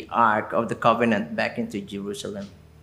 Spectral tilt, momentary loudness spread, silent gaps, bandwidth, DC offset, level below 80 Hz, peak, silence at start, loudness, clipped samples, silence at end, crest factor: -5.5 dB/octave; 13 LU; none; 14.5 kHz; under 0.1%; -58 dBFS; -4 dBFS; 0 s; -24 LUFS; under 0.1%; 0.25 s; 20 dB